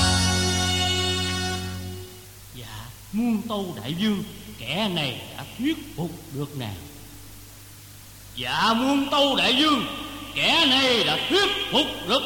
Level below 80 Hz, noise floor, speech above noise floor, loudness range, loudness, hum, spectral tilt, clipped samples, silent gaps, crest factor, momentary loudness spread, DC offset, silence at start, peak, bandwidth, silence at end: -46 dBFS; -44 dBFS; 21 dB; 10 LU; -23 LUFS; none; -3.5 dB/octave; under 0.1%; none; 18 dB; 24 LU; under 0.1%; 0 s; -6 dBFS; 17.5 kHz; 0 s